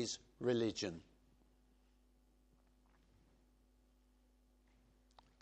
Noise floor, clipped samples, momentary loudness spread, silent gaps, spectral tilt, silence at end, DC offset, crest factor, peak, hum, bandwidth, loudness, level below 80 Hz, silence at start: -72 dBFS; under 0.1%; 10 LU; none; -4.5 dB/octave; 4.4 s; under 0.1%; 22 dB; -26 dBFS; none; 9.4 kHz; -40 LUFS; -72 dBFS; 0 s